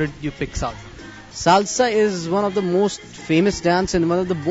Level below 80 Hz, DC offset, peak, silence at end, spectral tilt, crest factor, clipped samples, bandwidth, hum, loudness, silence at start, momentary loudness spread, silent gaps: -40 dBFS; under 0.1%; 0 dBFS; 0 s; -5 dB/octave; 20 dB; under 0.1%; 8 kHz; none; -20 LUFS; 0 s; 15 LU; none